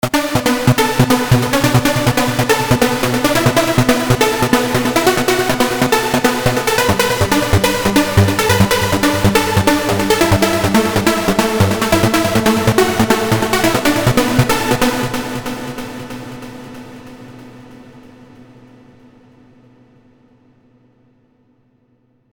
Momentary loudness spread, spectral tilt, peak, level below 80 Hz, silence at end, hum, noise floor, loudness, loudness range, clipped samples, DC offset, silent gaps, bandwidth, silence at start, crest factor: 10 LU; -4.5 dB/octave; 0 dBFS; -36 dBFS; 4.25 s; none; -58 dBFS; -14 LUFS; 8 LU; under 0.1%; under 0.1%; none; over 20 kHz; 0.05 s; 16 dB